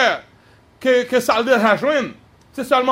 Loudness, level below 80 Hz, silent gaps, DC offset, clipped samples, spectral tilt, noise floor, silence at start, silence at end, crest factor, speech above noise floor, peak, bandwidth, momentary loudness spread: -17 LUFS; -60 dBFS; none; under 0.1%; under 0.1%; -4 dB/octave; -51 dBFS; 0 s; 0 s; 16 dB; 34 dB; -2 dBFS; 16 kHz; 15 LU